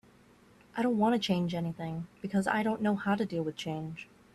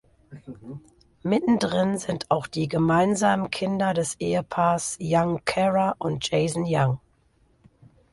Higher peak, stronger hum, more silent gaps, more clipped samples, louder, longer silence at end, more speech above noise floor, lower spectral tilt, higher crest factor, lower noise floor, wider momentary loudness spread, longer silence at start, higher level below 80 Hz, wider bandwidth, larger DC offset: second, -14 dBFS vs -6 dBFS; neither; neither; neither; second, -32 LUFS vs -24 LUFS; second, 0.3 s vs 1.15 s; second, 29 dB vs 39 dB; about the same, -6.5 dB/octave vs -5.5 dB/octave; about the same, 18 dB vs 18 dB; about the same, -60 dBFS vs -63 dBFS; about the same, 12 LU vs 13 LU; first, 0.75 s vs 0.3 s; second, -66 dBFS vs -56 dBFS; about the same, 12.5 kHz vs 11.5 kHz; neither